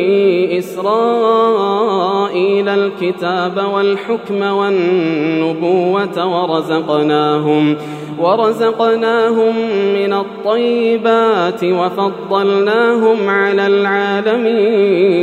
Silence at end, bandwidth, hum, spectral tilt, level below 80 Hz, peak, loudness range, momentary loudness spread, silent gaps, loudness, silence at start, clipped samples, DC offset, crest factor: 0 s; 13.5 kHz; none; -6.5 dB/octave; -72 dBFS; 0 dBFS; 2 LU; 5 LU; none; -14 LUFS; 0 s; under 0.1%; under 0.1%; 12 dB